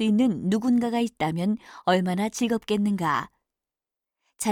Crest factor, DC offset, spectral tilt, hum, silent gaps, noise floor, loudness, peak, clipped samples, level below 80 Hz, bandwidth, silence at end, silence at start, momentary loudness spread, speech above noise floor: 16 dB; under 0.1%; -5.5 dB/octave; none; none; -90 dBFS; -25 LUFS; -8 dBFS; under 0.1%; -62 dBFS; 16.5 kHz; 0 s; 0 s; 6 LU; 66 dB